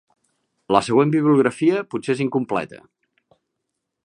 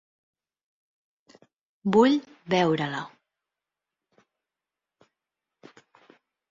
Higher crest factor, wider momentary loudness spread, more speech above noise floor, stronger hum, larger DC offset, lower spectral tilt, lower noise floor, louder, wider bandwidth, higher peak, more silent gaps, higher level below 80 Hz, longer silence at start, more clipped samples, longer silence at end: about the same, 20 dB vs 22 dB; second, 9 LU vs 14 LU; second, 60 dB vs 66 dB; neither; neither; about the same, -6.5 dB/octave vs -6.5 dB/octave; second, -79 dBFS vs -89 dBFS; first, -20 LUFS vs -24 LUFS; first, 10.5 kHz vs 7.6 kHz; first, -2 dBFS vs -8 dBFS; neither; first, -64 dBFS vs -70 dBFS; second, 0.7 s vs 1.85 s; neither; second, 1.25 s vs 3.45 s